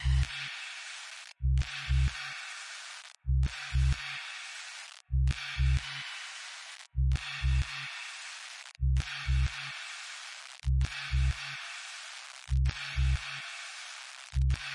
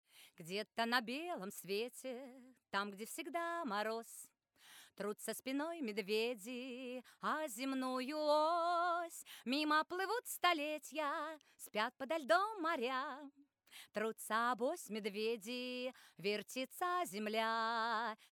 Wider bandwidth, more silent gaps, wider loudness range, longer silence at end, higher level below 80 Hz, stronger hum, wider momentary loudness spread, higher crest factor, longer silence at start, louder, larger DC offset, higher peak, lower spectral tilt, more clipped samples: second, 11 kHz vs over 20 kHz; neither; second, 2 LU vs 6 LU; about the same, 0 s vs 0.05 s; first, -34 dBFS vs under -90 dBFS; neither; about the same, 11 LU vs 13 LU; second, 14 dB vs 22 dB; second, 0 s vs 0.15 s; first, -34 LUFS vs -40 LUFS; neither; about the same, -18 dBFS vs -18 dBFS; about the same, -4 dB/octave vs -3 dB/octave; neither